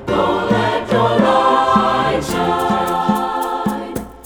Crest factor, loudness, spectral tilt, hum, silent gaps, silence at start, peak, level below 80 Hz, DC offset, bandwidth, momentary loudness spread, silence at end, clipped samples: 16 dB; -16 LUFS; -5.5 dB/octave; none; none; 0 s; 0 dBFS; -42 dBFS; under 0.1%; over 20 kHz; 7 LU; 0 s; under 0.1%